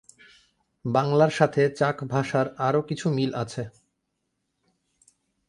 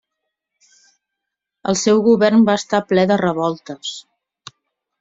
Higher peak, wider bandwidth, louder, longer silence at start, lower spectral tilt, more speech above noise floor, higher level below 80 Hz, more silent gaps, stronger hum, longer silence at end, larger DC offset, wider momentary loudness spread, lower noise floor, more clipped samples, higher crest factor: second, -6 dBFS vs -2 dBFS; first, 11.5 kHz vs 8 kHz; second, -24 LUFS vs -16 LUFS; second, 0.85 s vs 1.65 s; first, -6.5 dB/octave vs -5 dB/octave; second, 54 dB vs 65 dB; about the same, -64 dBFS vs -60 dBFS; neither; neither; first, 1.8 s vs 1 s; neither; second, 12 LU vs 15 LU; about the same, -78 dBFS vs -81 dBFS; neither; first, 22 dB vs 16 dB